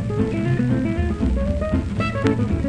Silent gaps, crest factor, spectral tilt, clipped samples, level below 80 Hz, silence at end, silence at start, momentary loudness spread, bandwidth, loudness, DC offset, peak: none; 16 dB; -8 dB/octave; under 0.1%; -28 dBFS; 0 s; 0 s; 2 LU; 10 kHz; -22 LUFS; under 0.1%; -4 dBFS